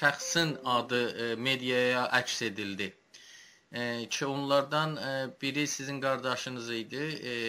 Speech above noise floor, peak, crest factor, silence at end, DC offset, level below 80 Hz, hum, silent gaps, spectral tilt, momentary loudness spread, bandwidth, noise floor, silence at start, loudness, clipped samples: 24 dB; -10 dBFS; 22 dB; 0 s; under 0.1%; -74 dBFS; none; none; -3.5 dB/octave; 9 LU; 16 kHz; -55 dBFS; 0 s; -31 LUFS; under 0.1%